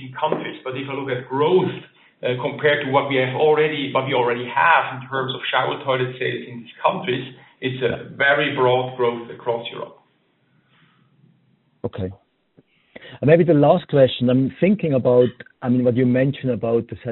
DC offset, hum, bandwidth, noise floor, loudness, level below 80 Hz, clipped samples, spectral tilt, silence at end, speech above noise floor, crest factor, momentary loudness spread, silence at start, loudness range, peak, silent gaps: under 0.1%; none; 4.2 kHz; -63 dBFS; -20 LUFS; -60 dBFS; under 0.1%; -4.5 dB/octave; 0 s; 44 dB; 20 dB; 13 LU; 0 s; 12 LU; -2 dBFS; none